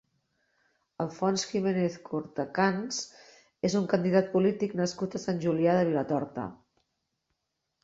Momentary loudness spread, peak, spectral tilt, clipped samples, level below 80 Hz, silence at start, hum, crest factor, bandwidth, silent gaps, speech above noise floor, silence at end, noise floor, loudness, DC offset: 11 LU; -10 dBFS; -5.5 dB/octave; under 0.1%; -68 dBFS; 1 s; none; 18 dB; 8 kHz; none; 54 dB; 1.3 s; -82 dBFS; -29 LUFS; under 0.1%